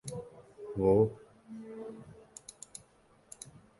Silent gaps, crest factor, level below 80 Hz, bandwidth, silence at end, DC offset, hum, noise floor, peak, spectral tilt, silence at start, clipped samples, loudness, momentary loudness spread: none; 22 dB; -60 dBFS; 11.5 kHz; 1.6 s; under 0.1%; none; -65 dBFS; -14 dBFS; -7 dB/octave; 0.05 s; under 0.1%; -31 LUFS; 24 LU